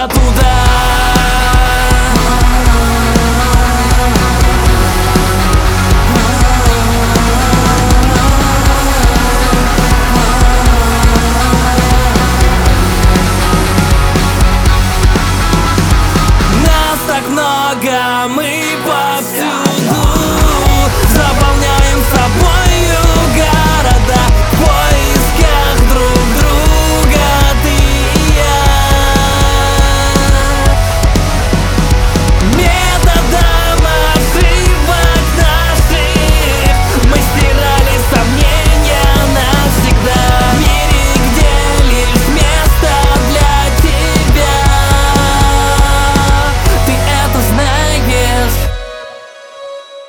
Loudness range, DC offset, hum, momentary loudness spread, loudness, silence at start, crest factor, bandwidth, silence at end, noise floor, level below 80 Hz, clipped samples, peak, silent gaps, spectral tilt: 1 LU; under 0.1%; none; 2 LU; -10 LUFS; 0 s; 8 dB; 18.5 kHz; 0.05 s; -31 dBFS; -12 dBFS; under 0.1%; 0 dBFS; none; -4.5 dB/octave